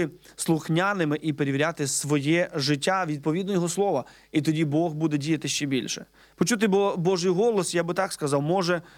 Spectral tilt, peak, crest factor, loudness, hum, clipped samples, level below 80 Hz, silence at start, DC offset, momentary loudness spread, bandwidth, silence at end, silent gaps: -5 dB/octave; -8 dBFS; 16 dB; -25 LUFS; none; under 0.1%; -64 dBFS; 0 s; under 0.1%; 5 LU; 17 kHz; 0.15 s; none